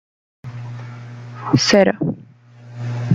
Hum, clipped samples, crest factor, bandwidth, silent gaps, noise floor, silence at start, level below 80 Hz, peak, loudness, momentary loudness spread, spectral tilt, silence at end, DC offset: none; under 0.1%; 18 dB; 9.4 kHz; none; -42 dBFS; 0.45 s; -56 dBFS; -2 dBFS; -17 LUFS; 22 LU; -5 dB/octave; 0 s; under 0.1%